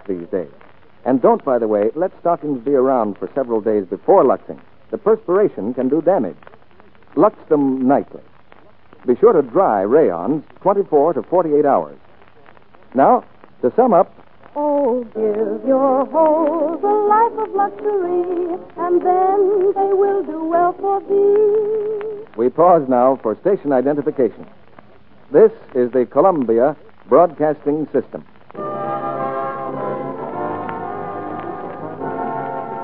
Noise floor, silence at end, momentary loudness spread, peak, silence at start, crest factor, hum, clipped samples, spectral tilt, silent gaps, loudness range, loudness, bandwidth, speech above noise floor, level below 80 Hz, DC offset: -49 dBFS; 0 s; 13 LU; 0 dBFS; 0.1 s; 16 dB; none; under 0.1%; -12.5 dB/octave; none; 4 LU; -17 LUFS; 4 kHz; 33 dB; -62 dBFS; 0.7%